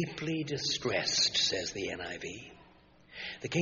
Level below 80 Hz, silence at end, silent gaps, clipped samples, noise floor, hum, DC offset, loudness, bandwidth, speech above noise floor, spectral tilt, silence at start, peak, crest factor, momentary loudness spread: -64 dBFS; 0 s; none; under 0.1%; -60 dBFS; none; under 0.1%; -31 LUFS; 7.2 kHz; 27 dB; -2.5 dB/octave; 0 s; -16 dBFS; 20 dB; 17 LU